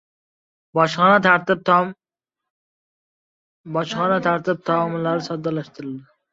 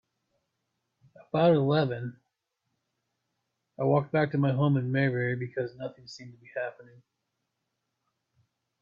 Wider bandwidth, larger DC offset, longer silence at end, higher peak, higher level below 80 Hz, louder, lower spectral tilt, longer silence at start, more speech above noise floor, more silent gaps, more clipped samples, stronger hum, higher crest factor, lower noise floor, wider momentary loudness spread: about the same, 7.8 kHz vs 7.2 kHz; neither; second, 0.3 s vs 2 s; first, -2 dBFS vs -12 dBFS; first, -64 dBFS vs -70 dBFS; first, -19 LUFS vs -28 LUFS; second, -6 dB/octave vs -8.5 dB/octave; second, 0.75 s vs 1.35 s; first, 67 dB vs 55 dB; first, 2.50-3.64 s vs none; neither; neither; about the same, 20 dB vs 20 dB; first, -86 dBFS vs -82 dBFS; second, 14 LU vs 17 LU